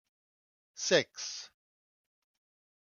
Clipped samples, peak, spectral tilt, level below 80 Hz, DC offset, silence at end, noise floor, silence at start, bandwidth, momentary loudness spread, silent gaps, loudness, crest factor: under 0.1%; -10 dBFS; -2 dB/octave; -82 dBFS; under 0.1%; 1.35 s; under -90 dBFS; 0.75 s; 10 kHz; 16 LU; none; -31 LUFS; 28 dB